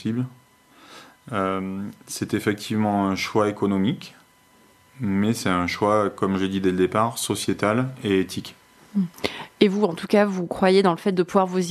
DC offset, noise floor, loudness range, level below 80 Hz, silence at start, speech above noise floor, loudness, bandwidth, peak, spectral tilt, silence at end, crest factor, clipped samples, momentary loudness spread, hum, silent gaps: under 0.1%; -56 dBFS; 3 LU; -60 dBFS; 0 s; 33 dB; -23 LUFS; 13.5 kHz; -4 dBFS; -5.5 dB/octave; 0 s; 20 dB; under 0.1%; 11 LU; none; none